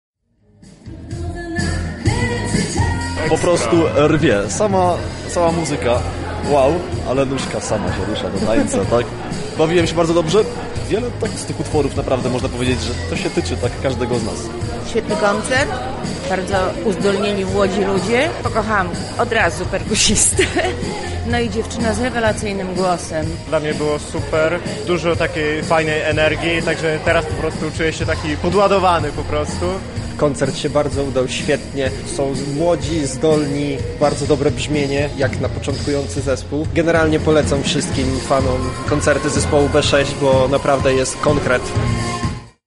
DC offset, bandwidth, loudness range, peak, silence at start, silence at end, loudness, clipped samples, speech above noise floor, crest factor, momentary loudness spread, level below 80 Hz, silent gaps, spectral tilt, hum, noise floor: under 0.1%; 11.5 kHz; 4 LU; 0 dBFS; 0.65 s; 0.2 s; -18 LUFS; under 0.1%; 37 dB; 16 dB; 8 LU; -32 dBFS; none; -4.5 dB/octave; none; -54 dBFS